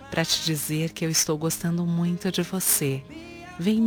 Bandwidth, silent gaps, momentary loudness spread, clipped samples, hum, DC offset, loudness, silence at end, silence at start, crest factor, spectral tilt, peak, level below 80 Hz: over 20 kHz; none; 10 LU; under 0.1%; none; under 0.1%; -25 LUFS; 0 s; 0 s; 20 dB; -4 dB/octave; -4 dBFS; -56 dBFS